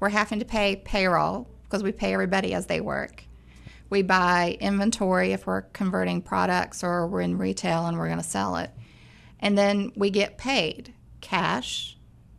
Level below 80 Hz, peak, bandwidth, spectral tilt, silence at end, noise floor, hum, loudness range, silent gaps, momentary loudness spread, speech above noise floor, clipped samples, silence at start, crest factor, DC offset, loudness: -48 dBFS; -8 dBFS; 12.5 kHz; -5 dB/octave; 0.05 s; -50 dBFS; none; 3 LU; none; 8 LU; 25 dB; under 0.1%; 0 s; 18 dB; under 0.1%; -25 LUFS